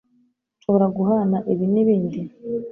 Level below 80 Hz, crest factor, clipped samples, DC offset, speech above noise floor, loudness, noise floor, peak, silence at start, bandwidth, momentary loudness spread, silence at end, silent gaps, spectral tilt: -62 dBFS; 14 dB; under 0.1%; under 0.1%; 44 dB; -20 LUFS; -64 dBFS; -6 dBFS; 0.7 s; 3.5 kHz; 11 LU; 0 s; none; -12 dB/octave